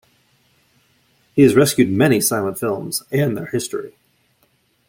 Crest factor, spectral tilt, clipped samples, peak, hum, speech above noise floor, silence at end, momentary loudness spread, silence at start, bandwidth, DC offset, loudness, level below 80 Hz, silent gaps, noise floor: 18 dB; -5 dB/octave; under 0.1%; -2 dBFS; none; 45 dB; 1 s; 12 LU; 1.35 s; 16.5 kHz; under 0.1%; -18 LUFS; -56 dBFS; none; -62 dBFS